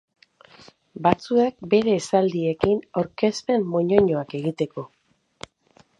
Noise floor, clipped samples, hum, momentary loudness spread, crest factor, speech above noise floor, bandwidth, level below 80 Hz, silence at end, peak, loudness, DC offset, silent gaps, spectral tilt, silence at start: -58 dBFS; under 0.1%; none; 20 LU; 22 dB; 37 dB; 11 kHz; -54 dBFS; 1.15 s; 0 dBFS; -22 LUFS; under 0.1%; none; -6.5 dB/octave; 0.95 s